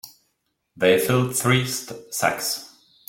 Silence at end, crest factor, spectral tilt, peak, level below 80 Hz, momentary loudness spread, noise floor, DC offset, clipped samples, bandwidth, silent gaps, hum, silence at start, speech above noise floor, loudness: 0.4 s; 20 dB; -4 dB/octave; -4 dBFS; -60 dBFS; 11 LU; -73 dBFS; under 0.1%; under 0.1%; 17 kHz; none; none; 0.05 s; 52 dB; -22 LUFS